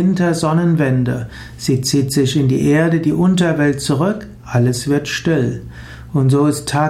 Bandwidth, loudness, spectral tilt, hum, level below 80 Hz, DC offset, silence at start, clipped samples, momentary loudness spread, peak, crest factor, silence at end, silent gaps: 15.5 kHz; -16 LUFS; -6 dB/octave; none; -42 dBFS; under 0.1%; 0 s; under 0.1%; 9 LU; -4 dBFS; 12 dB; 0 s; none